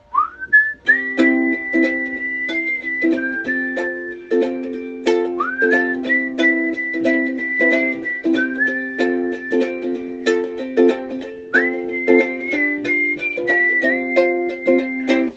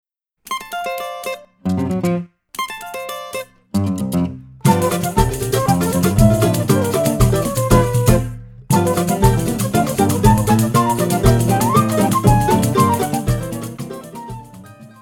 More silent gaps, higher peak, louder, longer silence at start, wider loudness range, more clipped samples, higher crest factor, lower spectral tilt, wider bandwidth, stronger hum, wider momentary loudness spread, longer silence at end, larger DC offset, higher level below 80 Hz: neither; about the same, -2 dBFS vs 0 dBFS; about the same, -18 LUFS vs -17 LUFS; second, 0.1 s vs 0.45 s; second, 3 LU vs 8 LU; neither; about the same, 18 dB vs 16 dB; second, -4.5 dB/octave vs -6 dB/octave; second, 8 kHz vs 19.5 kHz; neither; second, 7 LU vs 14 LU; second, 0 s vs 0.15 s; neither; second, -58 dBFS vs -30 dBFS